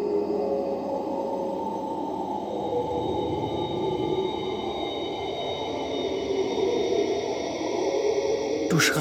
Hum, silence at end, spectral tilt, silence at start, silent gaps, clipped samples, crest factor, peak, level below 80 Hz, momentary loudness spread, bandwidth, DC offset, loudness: none; 0 s; -4.5 dB/octave; 0 s; none; under 0.1%; 18 dB; -10 dBFS; -54 dBFS; 5 LU; 16.5 kHz; under 0.1%; -27 LUFS